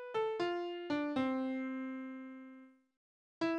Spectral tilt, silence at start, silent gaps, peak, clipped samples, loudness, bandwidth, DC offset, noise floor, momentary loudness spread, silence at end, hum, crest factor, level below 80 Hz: -6 dB/octave; 0 s; 2.97-3.41 s; -24 dBFS; under 0.1%; -38 LUFS; 8.6 kHz; under 0.1%; -58 dBFS; 16 LU; 0 s; none; 16 dB; -80 dBFS